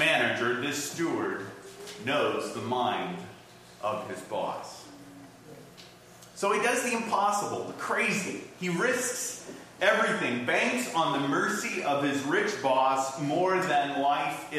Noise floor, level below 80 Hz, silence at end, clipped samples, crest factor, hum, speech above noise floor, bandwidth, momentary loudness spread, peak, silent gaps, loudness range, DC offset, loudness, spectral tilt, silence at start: -52 dBFS; -72 dBFS; 0 s; under 0.1%; 18 dB; none; 23 dB; 15.5 kHz; 17 LU; -10 dBFS; none; 8 LU; under 0.1%; -28 LUFS; -3.5 dB/octave; 0 s